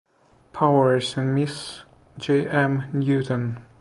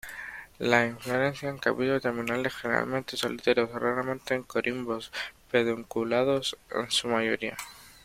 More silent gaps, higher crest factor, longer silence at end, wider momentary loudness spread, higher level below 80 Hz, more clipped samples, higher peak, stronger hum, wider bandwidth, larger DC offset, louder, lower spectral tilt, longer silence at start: neither; second, 18 dB vs 24 dB; about the same, 0.2 s vs 0.1 s; first, 15 LU vs 9 LU; about the same, -60 dBFS vs -62 dBFS; neither; about the same, -4 dBFS vs -4 dBFS; neither; second, 11.5 kHz vs 16.5 kHz; neither; first, -22 LUFS vs -28 LUFS; first, -6.5 dB/octave vs -4 dB/octave; first, 0.55 s vs 0.05 s